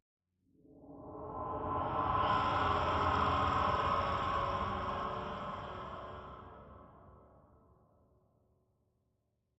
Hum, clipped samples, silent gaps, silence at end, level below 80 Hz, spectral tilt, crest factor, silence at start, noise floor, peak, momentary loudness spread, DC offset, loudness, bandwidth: none; under 0.1%; none; 2.4 s; -54 dBFS; -6.5 dB/octave; 18 dB; 0.75 s; -81 dBFS; -20 dBFS; 19 LU; under 0.1%; -35 LUFS; 8.2 kHz